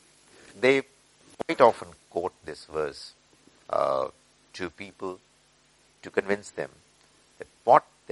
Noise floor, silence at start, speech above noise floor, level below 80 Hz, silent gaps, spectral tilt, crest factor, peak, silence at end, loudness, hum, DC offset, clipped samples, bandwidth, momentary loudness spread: -62 dBFS; 0.55 s; 36 dB; -68 dBFS; none; -5 dB/octave; 26 dB; -2 dBFS; 0.3 s; -27 LUFS; none; under 0.1%; under 0.1%; 11.5 kHz; 22 LU